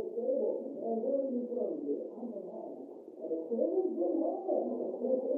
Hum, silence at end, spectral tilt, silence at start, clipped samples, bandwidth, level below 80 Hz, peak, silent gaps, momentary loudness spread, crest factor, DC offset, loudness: none; 0 s; -11.5 dB/octave; 0 s; under 0.1%; 1.4 kHz; under -90 dBFS; -20 dBFS; none; 12 LU; 14 dB; under 0.1%; -35 LUFS